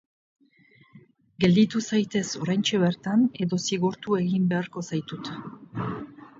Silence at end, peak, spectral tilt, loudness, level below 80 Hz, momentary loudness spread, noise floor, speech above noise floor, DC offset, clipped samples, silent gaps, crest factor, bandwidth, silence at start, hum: 0.15 s; -8 dBFS; -5.5 dB/octave; -25 LUFS; -62 dBFS; 14 LU; -59 dBFS; 34 dB; under 0.1%; under 0.1%; none; 18 dB; 7.8 kHz; 0.95 s; none